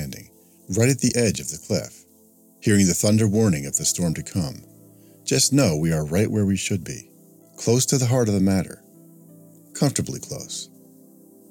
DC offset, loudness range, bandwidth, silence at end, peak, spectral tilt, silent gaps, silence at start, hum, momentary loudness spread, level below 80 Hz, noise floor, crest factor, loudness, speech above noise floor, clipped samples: under 0.1%; 3 LU; 17.5 kHz; 0.85 s; -6 dBFS; -4.5 dB/octave; none; 0 s; none; 16 LU; -50 dBFS; -54 dBFS; 18 dB; -22 LUFS; 33 dB; under 0.1%